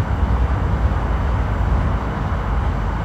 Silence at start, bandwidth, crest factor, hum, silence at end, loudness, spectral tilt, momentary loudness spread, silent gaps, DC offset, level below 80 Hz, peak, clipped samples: 0 s; 7.8 kHz; 12 dB; none; 0 s; -21 LUFS; -8 dB/octave; 3 LU; none; under 0.1%; -20 dBFS; -6 dBFS; under 0.1%